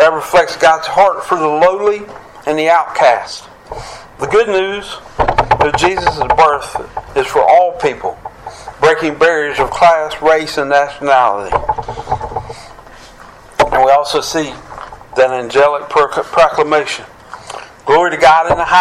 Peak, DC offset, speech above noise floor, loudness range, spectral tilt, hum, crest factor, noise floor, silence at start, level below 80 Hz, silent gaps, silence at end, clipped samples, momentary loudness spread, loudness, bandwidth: 0 dBFS; under 0.1%; 25 dB; 3 LU; -4 dB/octave; none; 12 dB; -37 dBFS; 0 s; -36 dBFS; none; 0 s; under 0.1%; 19 LU; -12 LUFS; 15 kHz